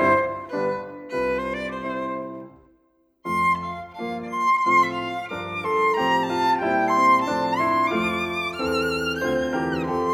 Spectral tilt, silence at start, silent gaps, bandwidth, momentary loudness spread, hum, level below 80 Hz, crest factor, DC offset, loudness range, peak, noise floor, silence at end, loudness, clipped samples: -5 dB/octave; 0 s; none; 16 kHz; 12 LU; none; -52 dBFS; 16 dB; under 0.1%; 7 LU; -8 dBFS; -63 dBFS; 0 s; -23 LUFS; under 0.1%